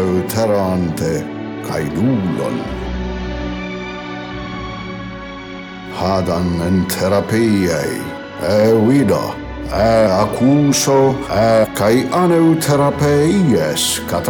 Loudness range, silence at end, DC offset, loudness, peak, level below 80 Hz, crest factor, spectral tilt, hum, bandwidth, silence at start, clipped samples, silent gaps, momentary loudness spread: 10 LU; 0 s; under 0.1%; -16 LUFS; -2 dBFS; -36 dBFS; 14 dB; -5.5 dB/octave; none; 19.5 kHz; 0 s; under 0.1%; none; 14 LU